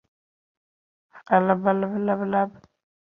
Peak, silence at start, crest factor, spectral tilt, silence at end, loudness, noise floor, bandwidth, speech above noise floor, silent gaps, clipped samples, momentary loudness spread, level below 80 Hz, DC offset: -4 dBFS; 1.15 s; 22 dB; -10 dB/octave; 0.65 s; -23 LUFS; under -90 dBFS; 3.8 kHz; over 68 dB; none; under 0.1%; 5 LU; -68 dBFS; under 0.1%